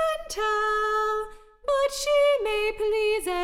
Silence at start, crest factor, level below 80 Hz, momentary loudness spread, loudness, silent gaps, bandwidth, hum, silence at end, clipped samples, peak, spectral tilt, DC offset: 0 s; 12 dB; -48 dBFS; 6 LU; -25 LUFS; none; 16.5 kHz; none; 0 s; under 0.1%; -14 dBFS; -1 dB/octave; under 0.1%